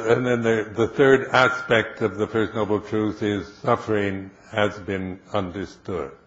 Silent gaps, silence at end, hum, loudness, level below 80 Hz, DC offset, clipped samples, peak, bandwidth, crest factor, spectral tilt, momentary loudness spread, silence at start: none; 0.1 s; none; -23 LUFS; -54 dBFS; under 0.1%; under 0.1%; -2 dBFS; 8 kHz; 20 dB; -6 dB/octave; 12 LU; 0 s